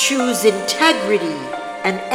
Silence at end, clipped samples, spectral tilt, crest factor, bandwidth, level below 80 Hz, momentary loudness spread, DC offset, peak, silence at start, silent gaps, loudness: 0 s; under 0.1%; -2.5 dB/octave; 18 dB; over 20 kHz; -62 dBFS; 10 LU; under 0.1%; 0 dBFS; 0 s; none; -17 LUFS